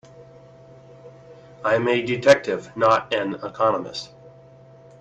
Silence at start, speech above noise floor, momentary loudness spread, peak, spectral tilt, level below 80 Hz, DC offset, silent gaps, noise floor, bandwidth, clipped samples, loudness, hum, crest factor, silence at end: 0.15 s; 27 dB; 13 LU; 0 dBFS; -5 dB/octave; -62 dBFS; under 0.1%; none; -48 dBFS; 8.6 kHz; under 0.1%; -21 LUFS; none; 24 dB; 0.7 s